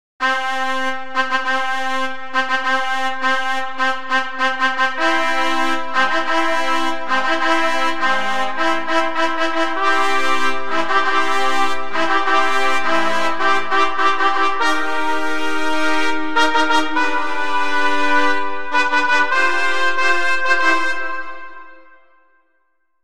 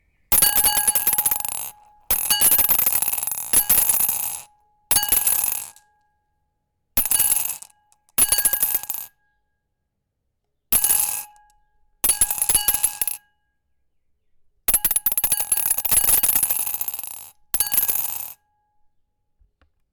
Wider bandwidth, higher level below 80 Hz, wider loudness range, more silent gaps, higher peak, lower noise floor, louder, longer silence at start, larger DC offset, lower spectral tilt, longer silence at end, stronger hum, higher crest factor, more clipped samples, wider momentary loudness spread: second, 16 kHz vs 19.5 kHz; second, -54 dBFS vs -46 dBFS; second, 2 LU vs 5 LU; neither; about the same, -2 dBFS vs -4 dBFS; second, -68 dBFS vs -76 dBFS; about the same, -18 LUFS vs -18 LUFS; about the same, 0.2 s vs 0.3 s; first, 10% vs under 0.1%; first, -2.5 dB/octave vs 0.5 dB/octave; second, 0 s vs 1.6 s; neither; about the same, 16 dB vs 18 dB; neither; second, 5 LU vs 14 LU